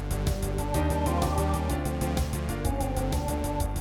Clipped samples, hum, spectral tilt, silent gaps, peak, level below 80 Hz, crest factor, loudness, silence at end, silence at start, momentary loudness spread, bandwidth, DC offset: under 0.1%; none; -6 dB/octave; none; -14 dBFS; -32 dBFS; 14 dB; -29 LUFS; 0 s; 0 s; 4 LU; 17.5 kHz; under 0.1%